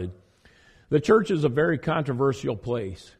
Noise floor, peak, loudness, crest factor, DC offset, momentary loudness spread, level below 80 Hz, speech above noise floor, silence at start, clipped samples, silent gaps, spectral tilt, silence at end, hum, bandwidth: -57 dBFS; -8 dBFS; -24 LUFS; 18 dB; under 0.1%; 10 LU; -54 dBFS; 33 dB; 0 s; under 0.1%; none; -7 dB/octave; 0.15 s; none; 10 kHz